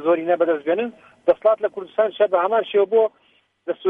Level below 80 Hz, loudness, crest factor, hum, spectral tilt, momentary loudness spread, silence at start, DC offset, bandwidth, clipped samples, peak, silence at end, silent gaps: -68 dBFS; -20 LUFS; 16 dB; none; -7.5 dB/octave; 7 LU; 0 s; under 0.1%; 3.9 kHz; under 0.1%; -4 dBFS; 0 s; none